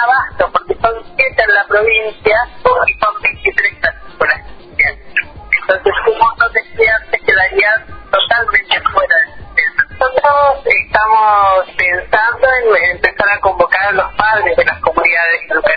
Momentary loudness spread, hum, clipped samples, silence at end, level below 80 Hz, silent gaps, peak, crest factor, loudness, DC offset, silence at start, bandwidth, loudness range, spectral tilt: 5 LU; none; 0.1%; 0 s; -38 dBFS; none; 0 dBFS; 12 dB; -12 LUFS; under 0.1%; 0 s; 6 kHz; 3 LU; -5.5 dB/octave